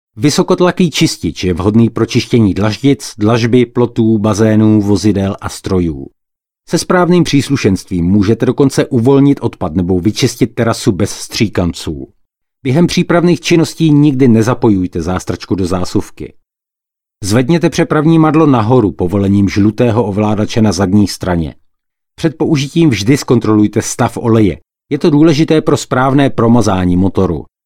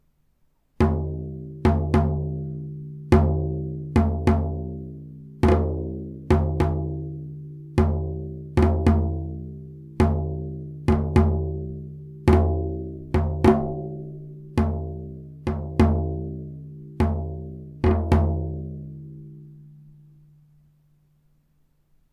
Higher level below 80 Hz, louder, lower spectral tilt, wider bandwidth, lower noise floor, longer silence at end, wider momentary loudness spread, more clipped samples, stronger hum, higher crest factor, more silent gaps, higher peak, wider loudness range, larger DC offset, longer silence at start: second, -36 dBFS vs -30 dBFS; first, -12 LUFS vs -24 LUFS; second, -6.5 dB/octave vs -9 dB/octave; first, 16 kHz vs 11 kHz; first, -84 dBFS vs -64 dBFS; second, 0.2 s vs 2.3 s; second, 9 LU vs 18 LU; neither; neither; second, 10 dB vs 20 dB; neither; first, 0 dBFS vs -4 dBFS; about the same, 3 LU vs 4 LU; neither; second, 0.15 s vs 0.8 s